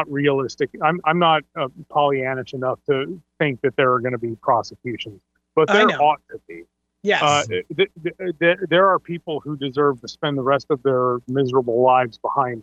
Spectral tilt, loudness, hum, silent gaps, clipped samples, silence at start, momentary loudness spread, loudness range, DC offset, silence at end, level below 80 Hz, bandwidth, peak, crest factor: -5.5 dB/octave; -20 LUFS; none; none; under 0.1%; 0 s; 12 LU; 2 LU; under 0.1%; 0 s; -64 dBFS; 8.2 kHz; -4 dBFS; 16 dB